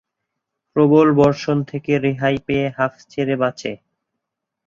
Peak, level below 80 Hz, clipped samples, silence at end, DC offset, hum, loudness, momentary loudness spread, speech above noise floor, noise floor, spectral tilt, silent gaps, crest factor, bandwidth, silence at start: -2 dBFS; -52 dBFS; under 0.1%; 0.9 s; under 0.1%; none; -18 LUFS; 12 LU; 63 dB; -80 dBFS; -7.5 dB/octave; none; 16 dB; 7.4 kHz; 0.75 s